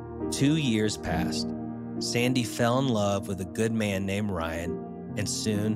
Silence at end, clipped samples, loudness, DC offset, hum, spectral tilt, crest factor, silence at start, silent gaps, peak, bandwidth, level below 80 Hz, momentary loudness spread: 0 s; under 0.1%; -28 LUFS; under 0.1%; none; -5 dB/octave; 16 dB; 0 s; none; -12 dBFS; 16 kHz; -52 dBFS; 8 LU